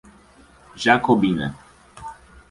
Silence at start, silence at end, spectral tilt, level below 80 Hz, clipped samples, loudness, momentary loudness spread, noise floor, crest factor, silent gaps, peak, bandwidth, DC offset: 0.75 s; 0.4 s; -5.5 dB/octave; -50 dBFS; under 0.1%; -19 LUFS; 22 LU; -51 dBFS; 20 dB; none; -2 dBFS; 11.5 kHz; under 0.1%